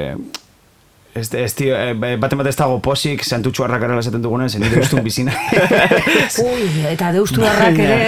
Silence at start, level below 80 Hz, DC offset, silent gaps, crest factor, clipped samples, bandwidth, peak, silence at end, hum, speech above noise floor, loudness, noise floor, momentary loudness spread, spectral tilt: 0 s; -40 dBFS; 0.4%; none; 16 dB; under 0.1%; 16 kHz; 0 dBFS; 0 s; none; 36 dB; -16 LUFS; -51 dBFS; 9 LU; -5 dB/octave